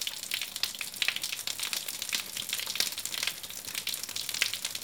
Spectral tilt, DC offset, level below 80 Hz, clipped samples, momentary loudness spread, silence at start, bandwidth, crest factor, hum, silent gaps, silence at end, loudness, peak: 1.5 dB/octave; under 0.1%; -72 dBFS; under 0.1%; 4 LU; 0 s; 19 kHz; 28 dB; none; none; 0 s; -31 LUFS; -6 dBFS